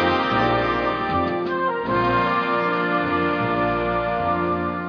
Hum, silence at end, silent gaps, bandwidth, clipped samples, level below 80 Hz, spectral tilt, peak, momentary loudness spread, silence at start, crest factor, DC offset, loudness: none; 0 s; none; 5.4 kHz; under 0.1%; -44 dBFS; -7.5 dB/octave; -6 dBFS; 3 LU; 0 s; 14 dB; under 0.1%; -21 LUFS